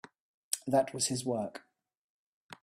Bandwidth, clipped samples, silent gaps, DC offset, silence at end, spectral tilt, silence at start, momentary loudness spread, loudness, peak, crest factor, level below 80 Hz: 15.5 kHz; under 0.1%; 1.97-2.49 s; under 0.1%; 0.1 s; -3.5 dB/octave; 0.5 s; 11 LU; -33 LUFS; -12 dBFS; 24 dB; -74 dBFS